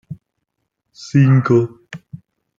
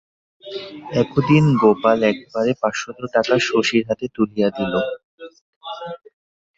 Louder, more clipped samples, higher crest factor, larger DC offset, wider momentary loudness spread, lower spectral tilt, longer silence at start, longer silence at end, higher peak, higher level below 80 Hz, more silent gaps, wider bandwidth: first, -15 LUFS vs -19 LUFS; neither; about the same, 16 dB vs 18 dB; neither; first, 25 LU vs 18 LU; first, -8.5 dB/octave vs -6 dB/octave; second, 0.1 s vs 0.45 s; second, 0.4 s vs 0.6 s; about the same, -2 dBFS vs -2 dBFS; about the same, -58 dBFS vs -56 dBFS; second, none vs 5.04-5.18 s, 5.41-5.61 s; about the same, 7.4 kHz vs 8 kHz